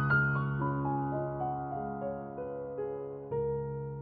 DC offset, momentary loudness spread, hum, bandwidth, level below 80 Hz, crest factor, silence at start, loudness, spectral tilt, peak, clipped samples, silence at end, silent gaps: under 0.1%; 9 LU; none; 4.6 kHz; -56 dBFS; 16 dB; 0 s; -34 LUFS; -8 dB/octave; -18 dBFS; under 0.1%; 0 s; none